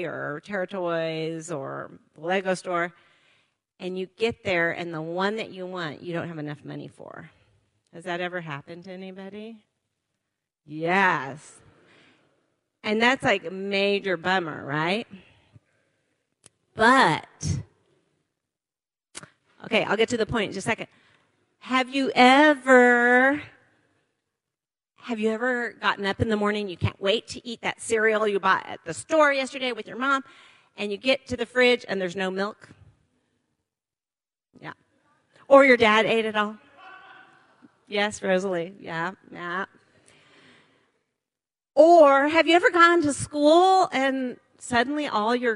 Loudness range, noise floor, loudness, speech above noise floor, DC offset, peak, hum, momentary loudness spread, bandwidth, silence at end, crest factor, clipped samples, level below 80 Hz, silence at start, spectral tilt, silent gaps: 13 LU; under -90 dBFS; -23 LUFS; over 67 dB; under 0.1%; -2 dBFS; none; 21 LU; 11.5 kHz; 0 s; 24 dB; under 0.1%; -60 dBFS; 0 s; -4.5 dB/octave; none